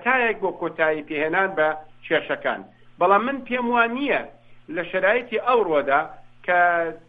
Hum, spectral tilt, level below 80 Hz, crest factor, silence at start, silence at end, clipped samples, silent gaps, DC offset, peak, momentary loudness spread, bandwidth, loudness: none; -7.5 dB/octave; -58 dBFS; 20 dB; 0 s; 0.1 s; under 0.1%; none; under 0.1%; -4 dBFS; 11 LU; 4.9 kHz; -22 LUFS